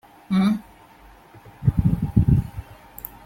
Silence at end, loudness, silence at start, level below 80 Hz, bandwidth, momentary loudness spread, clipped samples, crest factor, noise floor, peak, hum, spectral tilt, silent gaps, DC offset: 0.5 s; -22 LUFS; 0.3 s; -34 dBFS; 16.5 kHz; 18 LU; under 0.1%; 20 dB; -49 dBFS; -4 dBFS; none; -8.5 dB/octave; none; under 0.1%